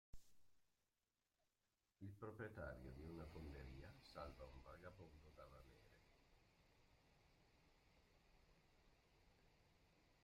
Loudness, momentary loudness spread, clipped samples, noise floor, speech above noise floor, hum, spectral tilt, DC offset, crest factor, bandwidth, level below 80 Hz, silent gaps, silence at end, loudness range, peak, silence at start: -59 LUFS; 11 LU; under 0.1%; under -90 dBFS; over 33 dB; none; -6.5 dB/octave; under 0.1%; 22 dB; 16 kHz; -70 dBFS; none; 0 s; 8 LU; -40 dBFS; 0.15 s